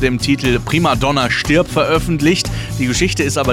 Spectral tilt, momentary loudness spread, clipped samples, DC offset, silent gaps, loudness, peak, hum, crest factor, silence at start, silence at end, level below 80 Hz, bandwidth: -4.5 dB/octave; 4 LU; under 0.1%; under 0.1%; none; -15 LUFS; -2 dBFS; none; 12 dB; 0 s; 0 s; -30 dBFS; 17 kHz